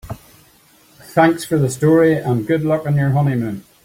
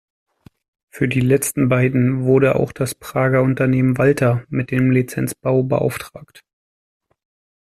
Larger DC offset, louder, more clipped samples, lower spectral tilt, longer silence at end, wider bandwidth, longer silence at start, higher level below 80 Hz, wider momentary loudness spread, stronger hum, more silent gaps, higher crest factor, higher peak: neither; about the same, -16 LUFS vs -18 LUFS; neither; about the same, -7 dB/octave vs -7 dB/octave; second, 0.25 s vs 1.4 s; first, 16.5 kHz vs 14 kHz; second, 0.05 s vs 0.95 s; about the same, -50 dBFS vs -50 dBFS; about the same, 10 LU vs 8 LU; neither; neither; about the same, 16 dB vs 16 dB; about the same, -2 dBFS vs -2 dBFS